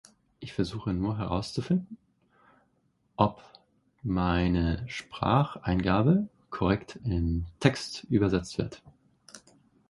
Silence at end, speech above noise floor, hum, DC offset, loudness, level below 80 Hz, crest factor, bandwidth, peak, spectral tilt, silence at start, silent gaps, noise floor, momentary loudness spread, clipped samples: 0.5 s; 43 dB; none; under 0.1%; -29 LUFS; -44 dBFS; 26 dB; 11.5 kHz; -4 dBFS; -7 dB/octave; 0.4 s; none; -71 dBFS; 12 LU; under 0.1%